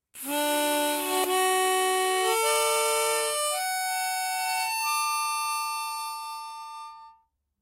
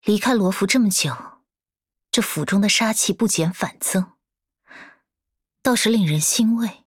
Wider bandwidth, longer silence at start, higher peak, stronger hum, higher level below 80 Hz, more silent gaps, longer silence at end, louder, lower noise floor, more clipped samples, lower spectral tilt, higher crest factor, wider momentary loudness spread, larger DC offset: second, 16 kHz vs 18 kHz; about the same, 0.15 s vs 0.05 s; second, -12 dBFS vs -4 dBFS; neither; second, -78 dBFS vs -62 dBFS; neither; first, 0.5 s vs 0.15 s; second, -26 LUFS vs -19 LUFS; second, -64 dBFS vs under -90 dBFS; neither; second, 1 dB/octave vs -3.5 dB/octave; about the same, 16 dB vs 16 dB; first, 13 LU vs 7 LU; neither